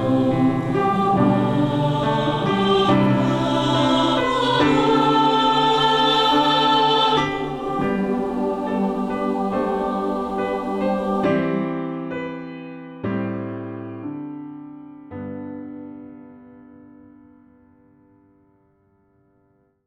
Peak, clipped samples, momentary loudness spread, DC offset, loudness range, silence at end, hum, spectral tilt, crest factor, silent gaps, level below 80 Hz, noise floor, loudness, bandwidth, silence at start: -6 dBFS; under 0.1%; 17 LU; under 0.1%; 18 LU; 3.45 s; none; -6 dB/octave; 16 dB; none; -48 dBFS; -62 dBFS; -20 LUFS; 12 kHz; 0 s